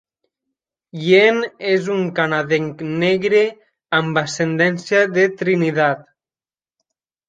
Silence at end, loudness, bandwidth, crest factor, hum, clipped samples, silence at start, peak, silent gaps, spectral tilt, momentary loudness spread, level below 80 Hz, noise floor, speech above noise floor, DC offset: 1.25 s; -17 LUFS; 9.2 kHz; 16 dB; none; under 0.1%; 0.95 s; -2 dBFS; none; -5.5 dB/octave; 7 LU; -64 dBFS; under -90 dBFS; over 73 dB; under 0.1%